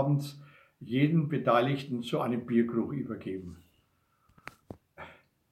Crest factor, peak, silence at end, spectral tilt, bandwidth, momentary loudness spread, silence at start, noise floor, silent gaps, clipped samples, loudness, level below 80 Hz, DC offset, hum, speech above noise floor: 20 dB; -12 dBFS; 0.4 s; -8 dB/octave; 13.5 kHz; 24 LU; 0 s; -71 dBFS; none; under 0.1%; -30 LUFS; -68 dBFS; under 0.1%; none; 42 dB